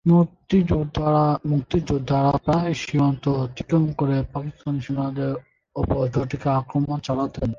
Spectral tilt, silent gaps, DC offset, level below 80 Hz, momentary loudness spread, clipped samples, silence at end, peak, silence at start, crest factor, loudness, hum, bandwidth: -8 dB/octave; none; under 0.1%; -40 dBFS; 8 LU; under 0.1%; 0 s; -6 dBFS; 0.05 s; 14 dB; -23 LUFS; none; 7.4 kHz